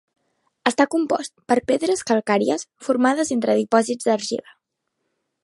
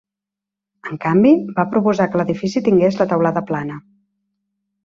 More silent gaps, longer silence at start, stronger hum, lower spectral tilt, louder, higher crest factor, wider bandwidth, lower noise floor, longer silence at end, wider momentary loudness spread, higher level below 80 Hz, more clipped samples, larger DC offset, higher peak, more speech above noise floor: neither; second, 0.65 s vs 0.85 s; neither; second, -4 dB/octave vs -8 dB/octave; second, -21 LUFS vs -17 LUFS; about the same, 20 dB vs 16 dB; first, 11.5 kHz vs 7.4 kHz; second, -77 dBFS vs -85 dBFS; about the same, 1.05 s vs 1.05 s; second, 6 LU vs 15 LU; second, -66 dBFS vs -56 dBFS; neither; neither; about the same, -2 dBFS vs -2 dBFS; second, 56 dB vs 69 dB